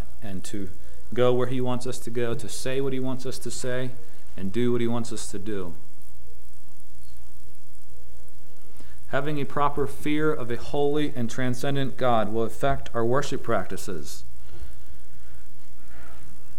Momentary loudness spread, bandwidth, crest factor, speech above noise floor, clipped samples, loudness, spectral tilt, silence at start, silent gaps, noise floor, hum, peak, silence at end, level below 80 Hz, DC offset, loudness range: 21 LU; 16 kHz; 20 dB; 25 dB; under 0.1%; -28 LUFS; -5.5 dB/octave; 0 s; none; -52 dBFS; 60 Hz at -50 dBFS; -8 dBFS; 0.05 s; -48 dBFS; 10%; 10 LU